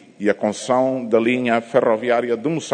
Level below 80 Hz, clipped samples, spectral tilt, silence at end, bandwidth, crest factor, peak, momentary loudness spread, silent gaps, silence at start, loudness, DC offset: -66 dBFS; under 0.1%; -5.5 dB/octave; 0 s; 9.6 kHz; 16 dB; -2 dBFS; 4 LU; none; 0.2 s; -19 LUFS; under 0.1%